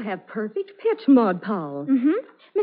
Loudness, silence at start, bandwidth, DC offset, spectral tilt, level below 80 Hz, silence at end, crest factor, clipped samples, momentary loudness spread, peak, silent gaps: -23 LUFS; 0 s; 4.8 kHz; under 0.1%; -6.5 dB/octave; -82 dBFS; 0 s; 16 dB; under 0.1%; 12 LU; -6 dBFS; none